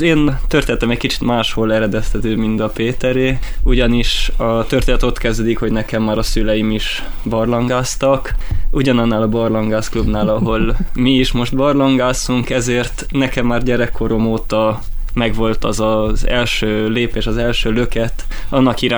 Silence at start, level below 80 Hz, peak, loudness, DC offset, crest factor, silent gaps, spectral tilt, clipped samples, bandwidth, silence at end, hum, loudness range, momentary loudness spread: 0 s; -20 dBFS; 0 dBFS; -16 LUFS; under 0.1%; 14 dB; none; -5.5 dB/octave; under 0.1%; over 20 kHz; 0 s; none; 2 LU; 5 LU